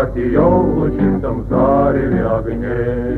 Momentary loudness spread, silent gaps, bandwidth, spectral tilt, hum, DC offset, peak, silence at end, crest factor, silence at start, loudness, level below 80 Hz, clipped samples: 6 LU; none; 4.3 kHz; -11 dB/octave; none; under 0.1%; 0 dBFS; 0 s; 14 dB; 0 s; -16 LUFS; -28 dBFS; under 0.1%